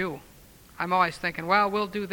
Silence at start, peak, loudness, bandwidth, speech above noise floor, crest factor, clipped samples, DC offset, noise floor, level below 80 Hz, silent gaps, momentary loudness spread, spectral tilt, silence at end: 0 s; -8 dBFS; -26 LUFS; over 20 kHz; 25 dB; 20 dB; under 0.1%; under 0.1%; -52 dBFS; -58 dBFS; none; 11 LU; -5 dB/octave; 0 s